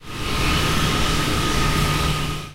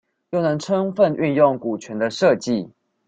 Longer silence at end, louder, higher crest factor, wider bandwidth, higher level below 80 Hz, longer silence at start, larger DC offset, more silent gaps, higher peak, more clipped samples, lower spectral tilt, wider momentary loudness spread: second, 0 s vs 0.4 s; about the same, -20 LUFS vs -20 LUFS; second, 12 dB vs 18 dB; first, 16 kHz vs 9 kHz; first, -28 dBFS vs -62 dBFS; second, 0 s vs 0.3 s; neither; neither; second, -8 dBFS vs -2 dBFS; neither; second, -4 dB/octave vs -6 dB/octave; second, 3 LU vs 9 LU